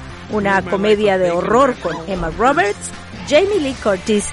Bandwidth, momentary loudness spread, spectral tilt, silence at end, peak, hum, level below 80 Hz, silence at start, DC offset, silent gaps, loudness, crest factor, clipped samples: 11.5 kHz; 9 LU; -4.5 dB/octave; 0 s; -2 dBFS; none; -38 dBFS; 0 s; under 0.1%; none; -16 LUFS; 14 dB; under 0.1%